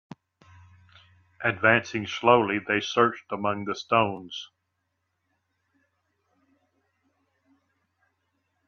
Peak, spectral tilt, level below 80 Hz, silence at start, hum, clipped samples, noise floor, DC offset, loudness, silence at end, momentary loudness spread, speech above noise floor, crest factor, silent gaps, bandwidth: -6 dBFS; -5 dB/octave; -70 dBFS; 1.4 s; none; under 0.1%; -78 dBFS; under 0.1%; -24 LUFS; 4.25 s; 14 LU; 53 dB; 24 dB; none; 7.2 kHz